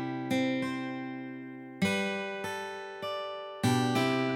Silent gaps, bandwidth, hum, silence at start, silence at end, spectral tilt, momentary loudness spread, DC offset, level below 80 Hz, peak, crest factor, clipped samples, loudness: none; 16.5 kHz; none; 0 s; 0 s; -5.5 dB/octave; 12 LU; under 0.1%; -72 dBFS; -16 dBFS; 16 dB; under 0.1%; -32 LUFS